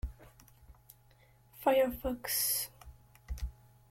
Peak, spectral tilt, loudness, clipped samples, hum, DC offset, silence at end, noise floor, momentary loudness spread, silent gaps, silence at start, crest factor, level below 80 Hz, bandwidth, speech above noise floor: -16 dBFS; -3 dB/octave; -33 LUFS; under 0.1%; none; under 0.1%; 0.4 s; -64 dBFS; 17 LU; none; 0.05 s; 22 dB; -48 dBFS; 16.5 kHz; 32 dB